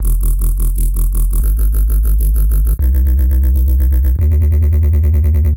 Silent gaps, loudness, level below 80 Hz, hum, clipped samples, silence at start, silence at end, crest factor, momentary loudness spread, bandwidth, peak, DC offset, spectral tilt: none; -15 LUFS; -12 dBFS; none; under 0.1%; 0 s; 0 s; 6 dB; 5 LU; 17 kHz; -4 dBFS; 0.6%; -7.5 dB/octave